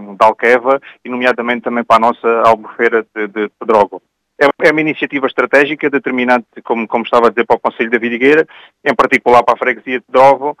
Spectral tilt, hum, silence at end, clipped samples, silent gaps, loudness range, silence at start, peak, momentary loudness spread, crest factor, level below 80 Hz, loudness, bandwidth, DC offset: -5.5 dB/octave; none; 0.1 s; 0.3%; none; 2 LU; 0 s; 0 dBFS; 8 LU; 12 dB; -54 dBFS; -12 LUFS; 12.5 kHz; under 0.1%